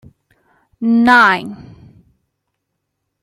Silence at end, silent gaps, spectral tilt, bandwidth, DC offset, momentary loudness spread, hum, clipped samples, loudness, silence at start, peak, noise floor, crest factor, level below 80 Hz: 1.7 s; none; -5 dB/octave; 10.5 kHz; under 0.1%; 14 LU; none; under 0.1%; -12 LUFS; 0.8 s; 0 dBFS; -74 dBFS; 16 dB; -56 dBFS